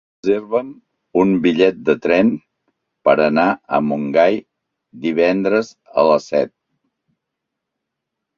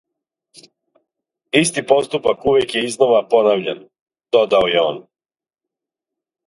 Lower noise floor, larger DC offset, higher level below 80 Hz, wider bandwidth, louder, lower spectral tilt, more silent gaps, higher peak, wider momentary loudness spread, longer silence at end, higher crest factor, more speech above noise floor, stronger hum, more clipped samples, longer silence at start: second, -79 dBFS vs -87 dBFS; neither; about the same, -58 dBFS vs -56 dBFS; second, 7.4 kHz vs 11.5 kHz; about the same, -17 LUFS vs -16 LUFS; first, -7 dB/octave vs -3.5 dB/octave; second, none vs 4.01-4.06 s; about the same, -2 dBFS vs 0 dBFS; about the same, 8 LU vs 7 LU; first, 1.9 s vs 1.45 s; about the same, 18 dB vs 18 dB; second, 63 dB vs 72 dB; neither; neither; second, 0.25 s vs 1.55 s